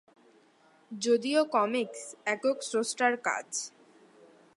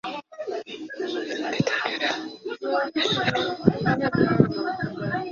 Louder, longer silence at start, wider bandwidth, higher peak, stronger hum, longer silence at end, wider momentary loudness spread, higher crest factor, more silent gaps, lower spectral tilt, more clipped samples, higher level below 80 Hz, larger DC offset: second, -30 LUFS vs -25 LUFS; first, 0.9 s vs 0.05 s; first, 11.5 kHz vs 7.4 kHz; second, -12 dBFS vs -2 dBFS; neither; first, 0.9 s vs 0 s; about the same, 10 LU vs 11 LU; about the same, 20 dB vs 24 dB; neither; second, -2.5 dB/octave vs -5.5 dB/octave; neither; second, -88 dBFS vs -56 dBFS; neither